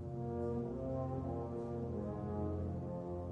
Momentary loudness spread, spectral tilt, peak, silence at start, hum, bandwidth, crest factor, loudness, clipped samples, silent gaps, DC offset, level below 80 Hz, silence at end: 2 LU; -10.5 dB/octave; -28 dBFS; 0 s; none; 7.2 kHz; 12 dB; -41 LUFS; under 0.1%; none; under 0.1%; -56 dBFS; 0 s